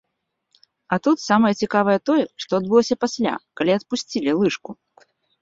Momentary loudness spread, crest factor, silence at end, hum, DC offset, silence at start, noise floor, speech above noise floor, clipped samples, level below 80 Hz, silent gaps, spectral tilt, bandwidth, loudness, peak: 7 LU; 18 dB; 0.7 s; none; under 0.1%; 0.9 s; -76 dBFS; 56 dB; under 0.1%; -62 dBFS; none; -5 dB/octave; 7.8 kHz; -21 LUFS; -4 dBFS